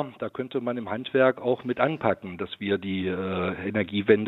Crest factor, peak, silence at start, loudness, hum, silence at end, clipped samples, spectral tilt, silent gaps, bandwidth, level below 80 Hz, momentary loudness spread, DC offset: 22 dB; -4 dBFS; 0 s; -27 LUFS; none; 0 s; under 0.1%; -8.5 dB/octave; none; 4.2 kHz; -68 dBFS; 9 LU; under 0.1%